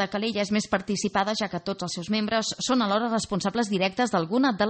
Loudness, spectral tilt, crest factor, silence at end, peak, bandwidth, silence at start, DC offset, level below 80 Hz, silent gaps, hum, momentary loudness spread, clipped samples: -26 LUFS; -4 dB/octave; 18 dB; 0 s; -8 dBFS; 8.8 kHz; 0 s; under 0.1%; -58 dBFS; none; none; 5 LU; under 0.1%